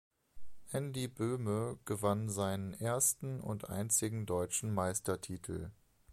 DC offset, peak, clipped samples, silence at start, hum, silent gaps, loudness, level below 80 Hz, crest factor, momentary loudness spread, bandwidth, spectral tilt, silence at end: under 0.1%; -18 dBFS; under 0.1%; 0.35 s; none; none; -36 LUFS; -62 dBFS; 20 dB; 10 LU; 15.5 kHz; -4.5 dB/octave; 0 s